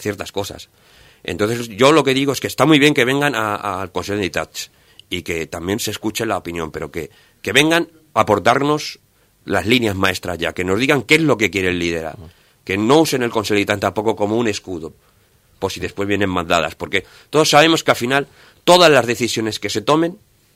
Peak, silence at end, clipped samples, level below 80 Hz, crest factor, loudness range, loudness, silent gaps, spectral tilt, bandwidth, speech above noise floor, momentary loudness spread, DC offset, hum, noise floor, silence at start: 0 dBFS; 0.4 s; under 0.1%; -50 dBFS; 18 dB; 7 LU; -17 LUFS; none; -4 dB/octave; 16 kHz; 38 dB; 16 LU; under 0.1%; none; -55 dBFS; 0 s